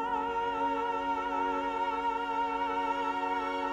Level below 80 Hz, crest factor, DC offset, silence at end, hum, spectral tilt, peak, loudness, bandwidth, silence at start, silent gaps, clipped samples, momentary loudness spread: -58 dBFS; 12 dB; under 0.1%; 0 s; none; -4.5 dB/octave; -20 dBFS; -32 LUFS; 9.4 kHz; 0 s; none; under 0.1%; 1 LU